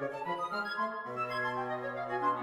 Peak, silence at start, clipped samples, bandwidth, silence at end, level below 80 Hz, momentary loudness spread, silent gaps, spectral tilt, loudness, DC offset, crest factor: -20 dBFS; 0 s; under 0.1%; 15.5 kHz; 0 s; -76 dBFS; 3 LU; none; -5.5 dB/octave; -35 LUFS; under 0.1%; 16 dB